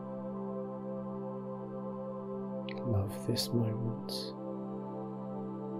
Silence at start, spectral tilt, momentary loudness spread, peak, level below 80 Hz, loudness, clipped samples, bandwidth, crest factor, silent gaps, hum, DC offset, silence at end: 0 s; -6.5 dB/octave; 8 LU; -18 dBFS; -70 dBFS; -38 LUFS; under 0.1%; 16 kHz; 18 dB; none; none; under 0.1%; 0 s